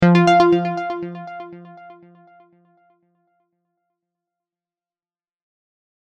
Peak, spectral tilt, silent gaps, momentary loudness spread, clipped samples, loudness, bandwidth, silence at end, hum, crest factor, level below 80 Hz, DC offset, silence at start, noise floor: -2 dBFS; -7.5 dB/octave; none; 24 LU; under 0.1%; -16 LUFS; 8.2 kHz; 4.45 s; none; 20 dB; -58 dBFS; under 0.1%; 0 s; under -90 dBFS